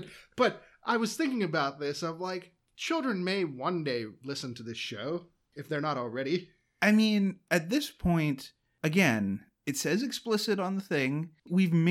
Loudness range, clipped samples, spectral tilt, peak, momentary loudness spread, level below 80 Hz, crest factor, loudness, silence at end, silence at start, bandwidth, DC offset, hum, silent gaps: 6 LU; under 0.1%; -5.5 dB/octave; -12 dBFS; 12 LU; -58 dBFS; 18 dB; -30 LUFS; 0 s; 0 s; 16.5 kHz; under 0.1%; none; none